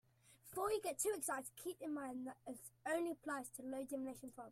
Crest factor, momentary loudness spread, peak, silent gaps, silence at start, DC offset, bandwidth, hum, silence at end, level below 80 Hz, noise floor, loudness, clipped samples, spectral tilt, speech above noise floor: 18 dB; 11 LU; -26 dBFS; none; 0.25 s; under 0.1%; 16 kHz; none; 0 s; -78 dBFS; -66 dBFS; -45 LUFS; under 0.1%; -3 dB/octave; 21 dB